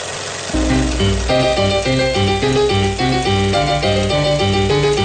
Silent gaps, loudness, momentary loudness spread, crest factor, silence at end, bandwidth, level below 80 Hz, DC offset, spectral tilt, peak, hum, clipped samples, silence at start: none; -16 LUFS; 2 LU; 10 dB; 0 s; 9.4 kHz; -26 dBFS; under 0.1%; -5 dB/octave; -6 dBFS; none; under 0.1%; 0 s